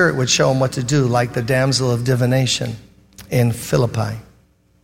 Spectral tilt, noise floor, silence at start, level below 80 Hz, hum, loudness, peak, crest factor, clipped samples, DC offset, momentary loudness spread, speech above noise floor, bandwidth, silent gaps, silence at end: -5 dB/octave; -55 dBFS; 0 s; -46 dBFS; none; -18 LUFS; -2 dBFS; 16 dB; under 0.1%; 0.2%; 9 LU; 38 dB; 16.5 kHz; none; 0.6 s